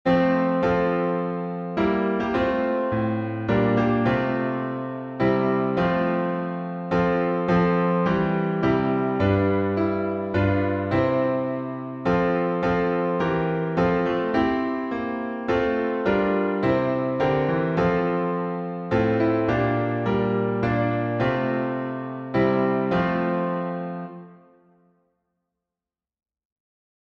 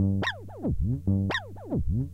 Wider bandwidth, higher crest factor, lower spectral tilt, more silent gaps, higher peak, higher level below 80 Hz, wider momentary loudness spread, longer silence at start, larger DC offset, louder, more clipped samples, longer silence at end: second, 6.6 kHz vs 8 kHz; about the same, 14 dB vs 12 dB; first, -9 dB/octave vs -7.5 dB/octave; neither; first, -8 dBFS vs -16 dBFS; second, -48 dBFS vs -38 dBFS; about the same, 7 LU vs 6 LU; about the same, 0.05 s vs 0 s; neither; first, -23 LUFS vs -29 LUFS; neither; first, 2.7 s vs 0 s